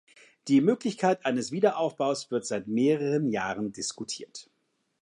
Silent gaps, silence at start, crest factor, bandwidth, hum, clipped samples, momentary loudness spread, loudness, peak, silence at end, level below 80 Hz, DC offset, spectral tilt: none; 0.45 s; 18 dB; 11 kHz; none; under 0.1%; 12 LU; -28 LUFS; -10 dBFS; 0.6 s; -72 dBFS; under 0.1%; -5 dB/octave